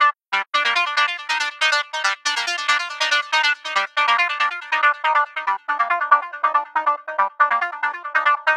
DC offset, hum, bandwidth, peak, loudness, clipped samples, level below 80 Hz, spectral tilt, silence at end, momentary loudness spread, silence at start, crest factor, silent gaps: under 0.1%; none; 12.5 kHz; 0 dBFS; -19 LUFS; under 0.1%; under -90 dBFS; 2.5 dB/octave; 0 s; 5 LU; 0 s; 20 dB; none